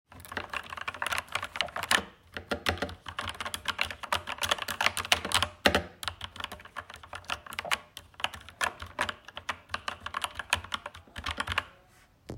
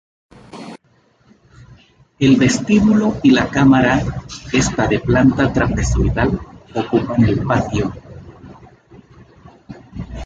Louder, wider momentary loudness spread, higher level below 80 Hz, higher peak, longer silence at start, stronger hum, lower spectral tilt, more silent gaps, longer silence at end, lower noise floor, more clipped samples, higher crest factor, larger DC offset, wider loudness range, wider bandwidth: second, -32 LUFS vs -16 LUFS; second, 14 LU vs 19 LU; second, -56 dBFS vs -32 dBFS; about the same, -4 dBFS vs -2 dBFS; second, 0.1 s vs 0.55 s; neither; second, -2 dB/octave vs -6 dB/octave; neither; about the same, 0 s vs 0 s; first, -60 dBFS vs -56 dBFS; neither; first, 30 dB vs 16 dB; neither; about the same, 6 LU vs 7 LU; first, 16.5 kHz vs 9.2 kHz